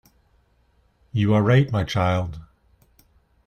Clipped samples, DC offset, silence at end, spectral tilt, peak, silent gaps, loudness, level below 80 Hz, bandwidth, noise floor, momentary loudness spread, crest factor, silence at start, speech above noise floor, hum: under 0.1%; under 0.1%; 1 s; -7.5 dB/octave; -6 dBFS; none; -21 LUFS; -48 dBFS; 9 kHz; -62 dBFS; 14 LU; 18 dB; 1.15 s; 43 dB; none